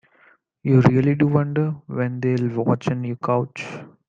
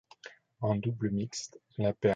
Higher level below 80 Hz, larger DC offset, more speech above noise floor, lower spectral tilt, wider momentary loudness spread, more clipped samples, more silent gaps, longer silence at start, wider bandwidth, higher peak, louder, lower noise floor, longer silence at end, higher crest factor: about the same, -56 dBFS vs -60 dBFS; neither; first, 37 dB vs 22 dB; first, -9 dB/octave vs -6 dB/octave; second, 12 LU vs 20 LU; neither; neither; first, 0.65 s vs 0.25 s; second, 7.4 kHz vs 9.2 kHz; first, -2 dBFS vs -12 dBFS; first, -21 LUFS vs -34 LUFS; about the same, -57 dBFS vs -54 dBFS; first, 0.25 s vs 0 s; about the same, 20 dB vs 20 dB